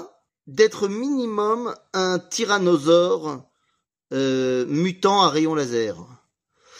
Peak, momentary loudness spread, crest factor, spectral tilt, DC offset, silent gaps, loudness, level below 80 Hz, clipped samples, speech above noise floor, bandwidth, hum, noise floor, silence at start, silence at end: -4 dBFS; 11 LU; 18 dB; -4.5 dB/octave; under 0.1%; none; -21 LUFS; -70 dBFS; under 0.1%; 52 dB; 15.5 kHz; none; -73 dBFS; 0 s; 0 s